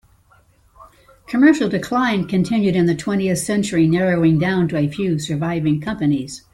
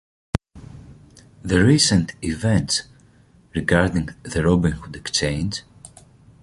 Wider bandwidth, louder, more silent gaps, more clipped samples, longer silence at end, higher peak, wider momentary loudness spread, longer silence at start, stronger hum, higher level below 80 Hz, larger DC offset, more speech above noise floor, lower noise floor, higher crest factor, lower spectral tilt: first, 13.5 kHz vs 11.5 kHz; first, -18 LUFS vs -21 LUFS; neither; neither; second, 0.15 s vs 0.55 s; about the same, -2 dBFS vs -2 dBFS; second, 6 LU vs 14 LU; first, 0.8 s vs 0.35 s; neither; second, -50 dBFS vs -38 dBFS; neither; first, 37 dB vs 33 dB; about the same, -54 dBFS vs -53 dBFS; about the same, 16 dB vs 20 dB; first, -6.5 dB/octave vs -4.5 dB/octave